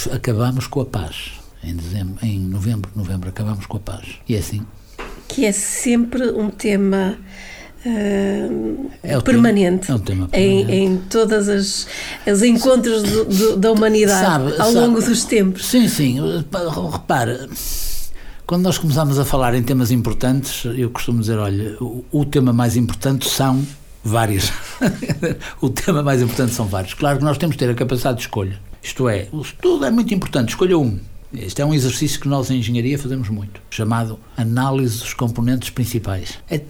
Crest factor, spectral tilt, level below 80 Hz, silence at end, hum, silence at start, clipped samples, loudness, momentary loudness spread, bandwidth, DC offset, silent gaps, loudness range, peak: 14 dB; -5.5 dB/octave; -36 dBFS; 0 s; none; 0 s; under 0.1%; -18 LUFS; 13 LU; 19.5 kHz; under 0.1%; none; 6 LU; -4 dBFS